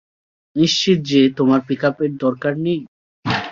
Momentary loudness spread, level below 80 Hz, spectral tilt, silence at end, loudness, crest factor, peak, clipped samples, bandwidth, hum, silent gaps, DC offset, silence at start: 9 LU; -56 dBFS; -5.5 dB/octave; 0 s; -18 LUFS; 16 dB; -2 dBFS; under 0.1%; 7.6 kHz; none; 2.88-3.23 s; under 0.1%; 0.55 s